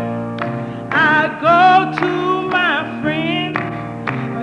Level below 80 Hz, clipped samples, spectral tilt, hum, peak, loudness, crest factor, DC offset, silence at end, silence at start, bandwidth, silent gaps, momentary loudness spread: -52 dBFS; under 0.1%; -6.5 dB/octave; none; -2 dBFS; -16 LUFS; 14 dB; under 0.1%; 0 s; 0 s; 9.6 kHz; none; 12 LU